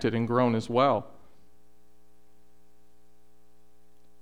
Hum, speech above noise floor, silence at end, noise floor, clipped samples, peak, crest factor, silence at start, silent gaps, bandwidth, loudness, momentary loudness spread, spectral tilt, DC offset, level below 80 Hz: none; 40 dB; 3.15 s; -65 dBFS; under 0.1%; -10 dBFS; 20 dB; 0 s; none; 10.5 kHz; -26 LUFS; 7 LU; -7 dB/octave; 0.5%; -64 dBFS